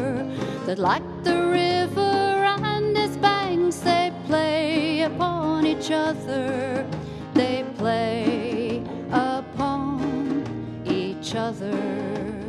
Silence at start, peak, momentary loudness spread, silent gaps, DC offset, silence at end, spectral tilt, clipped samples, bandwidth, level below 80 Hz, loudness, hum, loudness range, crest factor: 0 s; -4 dBFS; 7 LU; none; under 0.1%; 0 s; -5.5 dB/octave; under 0.1%; 13 kHz; -52 dBFS; -24 LUFS; none; 5 LU; 20 dB